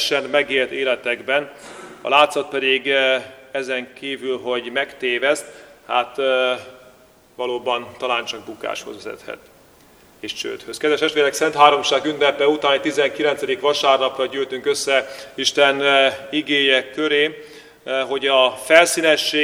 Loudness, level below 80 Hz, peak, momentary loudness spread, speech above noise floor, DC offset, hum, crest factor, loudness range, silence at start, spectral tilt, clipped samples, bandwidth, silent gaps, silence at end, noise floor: -18 LUFS; -64 dBFS; 0 dBFS; 15 LU; 31 dB; under 0.1%; none; 20 dB; 8 LU; 0 s; -2 dB/octave; under 0.1%; 16 kHz; none; 0 s; -51 dBFS